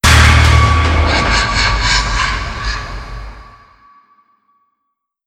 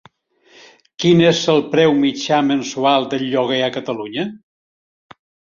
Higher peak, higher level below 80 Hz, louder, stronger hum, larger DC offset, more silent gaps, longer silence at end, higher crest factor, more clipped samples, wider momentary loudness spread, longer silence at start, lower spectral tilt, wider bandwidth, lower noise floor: about the same, 0 dBFS vs -2 dBFS; first, -18 dBFS vs -60 dBFS; first, -12 LUFS vs -17 LUFS; neither; neither; neither; first, 1.85 s vs 1.2 s; about the same, 14 dB vs 16 dB; neither; first, 20 LU vs 12 LU; second, 0.05 s vs 1 s; second, -3.5 dB/octave vs -5 dB/octave; first, 15 kHz vs 7.4 kHz; first, -73 dBFS vs -53 dBFS